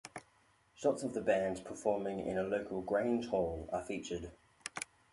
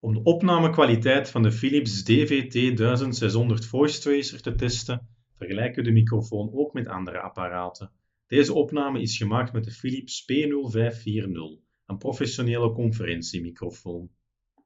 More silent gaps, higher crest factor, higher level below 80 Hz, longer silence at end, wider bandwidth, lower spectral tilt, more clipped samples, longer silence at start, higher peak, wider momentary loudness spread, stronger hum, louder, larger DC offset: neither; about the same, 20 dB vs 20 dB; second, -62 dBFS vs -48 dBFS; second, 0.3 s vs 0.6 s; first, 11.5 kHz vs 8 kHz; about the same, -5 dB/octave vs -6 dB/octave; neither; about the same, 0.05 s vs 0.05 s; second, -18 dBFS vs -6 dBFS; about the same, 12 LU vs 13 LU; neither; second, -37 LUFS vs -25 LUFS; neither